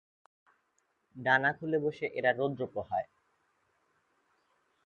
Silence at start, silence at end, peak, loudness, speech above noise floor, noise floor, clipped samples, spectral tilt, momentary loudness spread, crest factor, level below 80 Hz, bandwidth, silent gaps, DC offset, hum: 1.15 s; 1.8 s; -10 dBFS; -31 LUFS; 45 dB; -77 dBFS; under 0.1%; -7 dB/octave; 10 LU; 24 dB; -72 dBFS; 7.2 kHz; none; under 0.1%; none